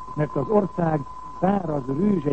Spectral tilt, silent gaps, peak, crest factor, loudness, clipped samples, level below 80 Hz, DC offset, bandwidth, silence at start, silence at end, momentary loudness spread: -10 dB/octave; none; -8 dBFS; 16 dB; -24 LUFS; under 0.1%; -50 dBFS; 0.9%; 8.2 kHz; 0 s; 0 s; 5 LU